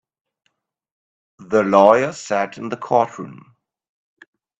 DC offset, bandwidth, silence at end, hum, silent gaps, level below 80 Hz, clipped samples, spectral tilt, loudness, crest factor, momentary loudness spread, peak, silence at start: under 0.1%; 8.4 kHz; 1.25 s; none; none; -66 dBFS; under 0.1%; -5.5 dB/octave; -17 LUFS; 20 dB; 17 LU; 0 dBFS; 1.4 s